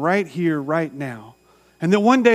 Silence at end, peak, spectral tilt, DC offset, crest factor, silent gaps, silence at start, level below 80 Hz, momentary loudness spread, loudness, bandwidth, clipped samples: 0 s; -2 dBFS; -6.5 dB/octave; under 0.1%; 18 dB; none; 0 s; -68 dBFS; 16 LU; -20 LUFS; 14.5 kHz; under 0.1%